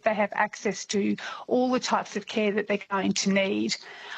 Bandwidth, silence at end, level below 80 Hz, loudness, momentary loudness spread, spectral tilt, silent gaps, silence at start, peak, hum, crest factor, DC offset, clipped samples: 8.6 kHz; 0 s; -70 dBFS; -27 LUFS; 6 LU; -4 dB/octave; none; 0.05 s; -10 dBFS; none; 18 dB; under 0.1%; under 0.1%